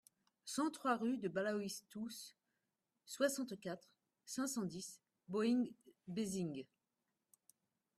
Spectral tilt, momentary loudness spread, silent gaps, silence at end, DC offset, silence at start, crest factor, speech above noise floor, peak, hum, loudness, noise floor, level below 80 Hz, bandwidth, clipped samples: -4.5 dB/octave; 15 LU; none; 1.35 s; under 0.1%; 0.45 s; 20 dB; 48 dB; -24 dBFS; none; -42 LUFS; -89 dBFS; -84 dBFS; 15.5 kHz; under 0.1%